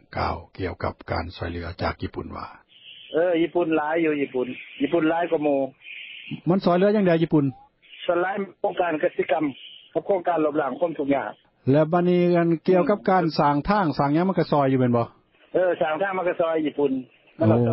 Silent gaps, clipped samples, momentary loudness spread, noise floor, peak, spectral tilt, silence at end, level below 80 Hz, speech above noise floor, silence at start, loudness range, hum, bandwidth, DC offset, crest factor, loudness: none; under 0.1%; 12 LU; -46 dBFS; -6 dBFS; -11.5 dB/octave; 0 s; -48 dBFS; 23 dB; 0.1 s; 5 LU; none; 5.8 kHz; under 0.1%; 16 dB; -23 LUFS